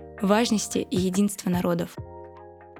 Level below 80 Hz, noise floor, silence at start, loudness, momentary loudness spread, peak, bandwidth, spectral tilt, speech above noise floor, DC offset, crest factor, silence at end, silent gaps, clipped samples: -52 dBFS; -46 dBFS; 0 s; -25 LUFS; 20 LU; -6 dBFS; 17 kHz; -5 dB/octave; 22 dB; under 0.1%; 20 dB; 0 s; none; under 0.1%